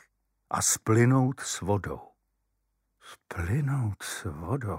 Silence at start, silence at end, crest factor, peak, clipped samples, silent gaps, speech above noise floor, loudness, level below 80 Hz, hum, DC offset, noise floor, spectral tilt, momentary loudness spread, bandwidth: 0.5 s; 0 s; 18 dB; -12 dBFS; under 0.1%; none; 50 dB; -28 LUFS; -52 dBFS; none; under 0.1%; -77 dBFS; -5 dB/octave; 13 LU; 16 kHz